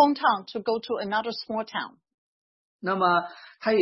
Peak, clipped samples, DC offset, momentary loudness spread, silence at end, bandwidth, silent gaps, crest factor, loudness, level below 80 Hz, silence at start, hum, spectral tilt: -8 dBFS; under 0.1%; under 0.1%; 11 LU; 0 s; 6 kHz; 2.14-2.79 s; 18 dB; -27 LUFS; -72 dBFS; 0 s; none; -6.5 dB/octave